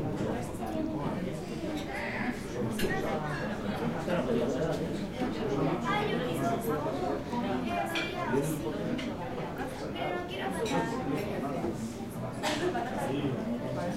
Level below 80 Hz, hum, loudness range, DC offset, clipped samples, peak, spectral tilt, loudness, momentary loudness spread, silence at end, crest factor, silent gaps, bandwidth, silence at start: -50 dBFS; none; 3 LU; under 0.1%; under 0.1%; -16 dBFS; -6 dB/octave; -33 LUFS; 6 LU; 0 s; 16 dB; none; 16 kHz; 0 s